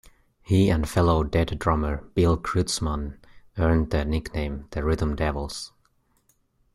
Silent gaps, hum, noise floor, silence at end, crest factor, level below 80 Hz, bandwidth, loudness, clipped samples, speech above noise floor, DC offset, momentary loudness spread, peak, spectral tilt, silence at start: none; none; -66 dBFS; 1.05 s; 18 dB; -34 dBFS; 13.5 kHz; -25 LUFS; under 0.1%; 43 dB; under 0.1%; 10 LU; -8 dBFS; -6 dB/octave; 0.5 s